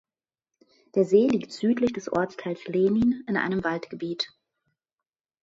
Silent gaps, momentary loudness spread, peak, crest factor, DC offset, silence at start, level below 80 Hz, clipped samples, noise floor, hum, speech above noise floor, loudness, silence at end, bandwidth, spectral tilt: none; 11 LU; -8 dBFS; 18 dB; under 0.1%; 0.95 s; -62 dBFS; under 0.1%; under -90 dBFS; none; over 65 dB; -26 LUFS; 1.15 s; 7.8 kHz; -6.5 dB/octave